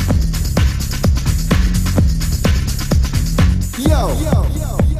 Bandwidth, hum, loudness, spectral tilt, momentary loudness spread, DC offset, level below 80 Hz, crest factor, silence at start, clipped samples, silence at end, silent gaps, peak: 15.5 kHz; none; -16 LUFS; -5.5 dB/octave; 2 LU; under 0.1%; -18 dBFS; 12 dB; 0 s; under 0.1%; 0 s; none; -2 dBFS